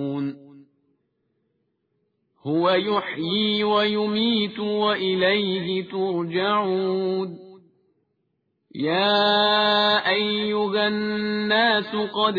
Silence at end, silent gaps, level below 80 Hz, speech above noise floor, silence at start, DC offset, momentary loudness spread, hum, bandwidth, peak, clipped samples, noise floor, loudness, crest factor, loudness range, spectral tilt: 0 s; none; -66 dBFS; 52 dB; 0 s; under 0.1%; 9 LU; none; 5 kHz; -8 dBFS; under 0.1%; -74 dBFS; -22 LUFS; 16 dB; 6 LU; -7 dB/octave